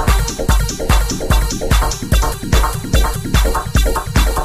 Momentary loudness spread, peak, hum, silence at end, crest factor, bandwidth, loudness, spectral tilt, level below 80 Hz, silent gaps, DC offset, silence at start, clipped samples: 1 LU; 0 dBFS; none; 0 s; 14 dB; 15.5 kHz; -17 LUFS; -4.5 dB/octave; -16 dBFS; none; under 0.1%; 0 s; under 0.1%